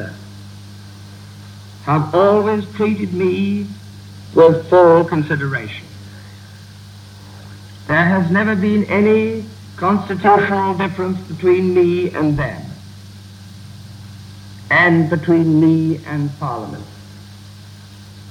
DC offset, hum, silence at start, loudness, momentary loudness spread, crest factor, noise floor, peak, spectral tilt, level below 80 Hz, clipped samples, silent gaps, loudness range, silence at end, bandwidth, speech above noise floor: under 0.1%; 50 Hz at -40 dBFS; 0 s; -15 LUFS; 25 LU; 18 dB; -37 dBFS; 0 dBFS; -7.5 dB/octave; -50 dBFS; under 0.1%; none; 5 LU; 0 s; 14 kHz; 23 dB